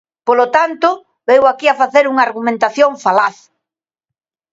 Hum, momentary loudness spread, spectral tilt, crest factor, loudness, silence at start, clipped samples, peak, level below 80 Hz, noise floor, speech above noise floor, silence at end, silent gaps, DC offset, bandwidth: none; 5 LU; -4 dB/octave; 14 dB; -13 LUFS; 0.25 s; under 0.1%; 0 dBFS; -62 dBFS; -85 dBFS; 72 dB; 1.2 s; none; under 0.1%; 7.8 kHz